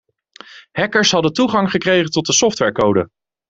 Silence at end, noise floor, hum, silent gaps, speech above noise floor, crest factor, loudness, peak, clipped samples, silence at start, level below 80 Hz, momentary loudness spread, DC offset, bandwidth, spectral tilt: 0.45 s; -43 dBFS; none; none; 27 dB; 16 dB; -15 LUFS; 0 dBFS; under 0.1%; 0.5 s; -52 dBFS; 7 LU; under 0.1%; 8.2 kHz; -3.5 dB/octave